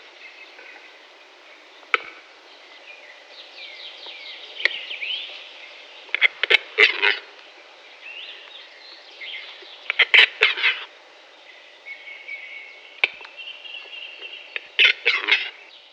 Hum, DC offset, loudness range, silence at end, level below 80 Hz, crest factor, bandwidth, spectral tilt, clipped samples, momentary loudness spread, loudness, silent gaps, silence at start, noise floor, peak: none; under 0.1%; 12 LU; 0.4 s; -86 dBFS; 26 dB; 10.5 kHz; 1.5 dB/octave; under 0.1%; 26 LU; -19 LUFS; none; 0.2 s; -48 dBFS; 0 dBFS